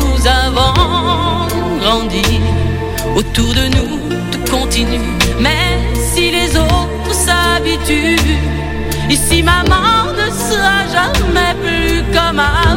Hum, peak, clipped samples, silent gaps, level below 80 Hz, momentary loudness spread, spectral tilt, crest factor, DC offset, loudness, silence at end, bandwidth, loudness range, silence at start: none; 0 dBFS; under 0.1%; none; -20 dBFS; 6 LU; -4 dB/octave; 12 dB; under 0.1%; -13 LUFS; 0 s; 17 kHz; 2 LU; 0 s